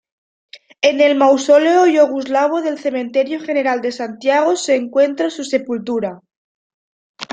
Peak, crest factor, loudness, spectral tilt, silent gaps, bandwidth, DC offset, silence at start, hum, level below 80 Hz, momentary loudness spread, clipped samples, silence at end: -2 dBFS; 14 dB; -16 LUFS; -3.5 dB/octave; 6.37-7.14 s; 9.2 kHz; under 0.1%; 0.55 s; none; -68 dBFS; 10 LU; under 0.1%; 0.1 s